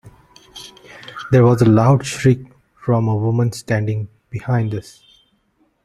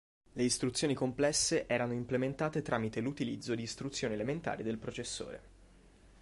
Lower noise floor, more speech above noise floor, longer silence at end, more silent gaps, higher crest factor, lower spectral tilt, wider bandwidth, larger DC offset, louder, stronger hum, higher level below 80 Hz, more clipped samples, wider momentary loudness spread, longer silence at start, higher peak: about the same, -62 dBFS vs -60 dBFS; first, 47 dB vs 26 dB; first, 1.05 s vs 0.15 s; neither; about the same, 18 dB vs 18 dB; first, -7.5 dB/octave vs -4 dB/octave; about the same, 12.5 kHz vs 11.5 kHz; neither; first, -17 LUFS vs -35 LUFS; neither; first, -50 dBFS vs -60 dBFS; neither; first, 24 LU vs 9 LU; second, 0.05 s vs 0.35 s; first, 0 dBFS vs -18 dBFS